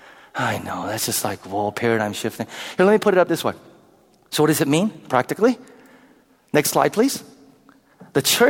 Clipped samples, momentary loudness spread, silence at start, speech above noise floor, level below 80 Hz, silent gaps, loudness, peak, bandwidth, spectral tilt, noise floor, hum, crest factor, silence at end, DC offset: under 0.1%; 11 LU; 0.35 s; 35 dB; -62 dBFS; none; -21 LUFS; -2 dBFS; 19.5 kHz; -4 dB/octave; -55 dBFS; none; 20 dB; 0 s; under 0.1%